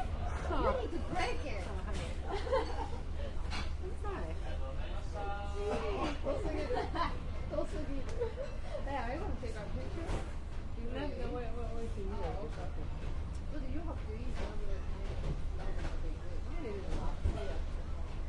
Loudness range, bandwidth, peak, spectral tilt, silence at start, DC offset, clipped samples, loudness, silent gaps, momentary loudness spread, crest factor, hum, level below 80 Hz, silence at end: 4 LU; 10.5 kHz; -20 dBFS; -6.5 dB/octave; 0 s; under 0.1%; under 0.1%; -40 LUFS; none; 7 LU; 16 dB; none; -40 dBFS; 0 s